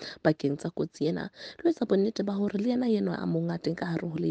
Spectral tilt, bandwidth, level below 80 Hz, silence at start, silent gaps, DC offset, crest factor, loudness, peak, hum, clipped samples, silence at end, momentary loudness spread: -7.5 dB/octave; 9 kHz; -66 dBFS; 0 s; none; under 0.1%; 20 dB; -29 LUFS; -10 dBFS; none; under 0.1%; 0 s; 5 LU